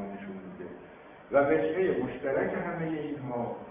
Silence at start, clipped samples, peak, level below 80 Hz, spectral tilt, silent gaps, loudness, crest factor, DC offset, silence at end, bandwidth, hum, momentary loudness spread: 0 s; under 0.1%; -10 dBFS; -62 dBFS; -6 dB/octave; none; -30 LUFS; 20 dB; under 0.1%; 0 s; 3.7 kHz; none; 18 LU